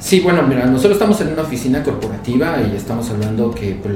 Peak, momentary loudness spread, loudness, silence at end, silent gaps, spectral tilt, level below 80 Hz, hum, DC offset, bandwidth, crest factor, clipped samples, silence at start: 0 dBFS; 8 LU; -16 LUFS; 0 s; none; -6 dB/octave; -38 dBFS; none; under 0.1%; 17 kHz; 16 dB; under 0.1%; 0 s